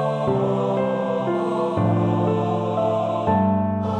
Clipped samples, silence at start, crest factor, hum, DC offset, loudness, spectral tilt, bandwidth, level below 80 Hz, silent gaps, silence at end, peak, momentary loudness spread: under 0.1%; 0 s; 12 dB; none; under 0.1%; -21 LUFS; -9 dB/octave; 9 kHz; -54 dBFS; none; 0 s; -8 dBFS; 3 LU